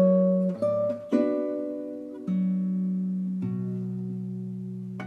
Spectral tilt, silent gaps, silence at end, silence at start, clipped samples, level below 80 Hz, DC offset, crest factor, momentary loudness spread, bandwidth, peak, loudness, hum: -11 dB/octave; none; 0 s; 0 s; under 0.1%; -76 dBFS; under 0.1%; 16 dB; 11 LU; 4.2 kHz; -12 dBFS; -28 LUFS; none